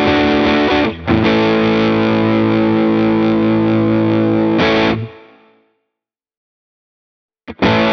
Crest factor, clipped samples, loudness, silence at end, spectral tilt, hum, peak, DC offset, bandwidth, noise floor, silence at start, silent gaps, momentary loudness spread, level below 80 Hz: 14 dB; under 0.1%; -13 LUFS; 0 s; -7.5 dB/octave; none; 0 dBFS; under 0.1%; 6.4 kHz; -82 dBFS; 0 s; 6.37-7.29 s; 3 LU; -40 dBFS